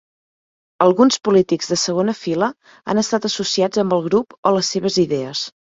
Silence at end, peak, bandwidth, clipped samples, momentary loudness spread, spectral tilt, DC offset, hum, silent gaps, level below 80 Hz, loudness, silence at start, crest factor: 0.3 s; -2 dBFS; 7.8 kHz; under 0.1%; 8 LU; -4.5 dB/octave; under 0.1%; none; 4.38-4.43 s; -60 dBFS; -18 LUFS; 0.8 s; 18 dB